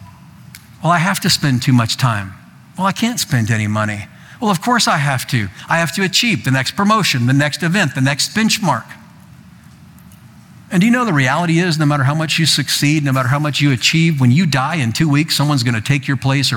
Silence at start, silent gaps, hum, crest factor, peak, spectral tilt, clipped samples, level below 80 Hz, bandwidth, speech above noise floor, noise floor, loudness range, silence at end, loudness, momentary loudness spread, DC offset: 0 s; none; none; 14 dB; -2 dBFS; -4.5 dB/octave; under 0.1%; -52 dBFS; 18.5 kHz; 26 dB; -41 dBFS; 4 LU; 0 s; -15 LUFS; 6 LU; under 0.1%